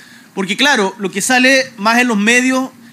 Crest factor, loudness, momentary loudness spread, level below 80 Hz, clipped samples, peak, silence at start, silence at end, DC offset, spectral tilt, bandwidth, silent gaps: 14 dB; -12 LUFS; 10 LU; -70 dBFS; under 0.1%; 0 dBFS; 0.35 s; 0.25 s; under 0.1%; -2.5 dB/octave; 16 kHz; none